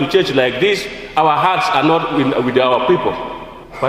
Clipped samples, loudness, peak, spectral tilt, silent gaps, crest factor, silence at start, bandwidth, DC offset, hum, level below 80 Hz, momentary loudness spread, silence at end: under 0.1%; -15 LUFS; 0 dBFS; -5.5 dB/octave; none; 16 dB; 0 s; 15.5 kHz; under 0.1%; none; -46 dBFS; 10 LU; 0 s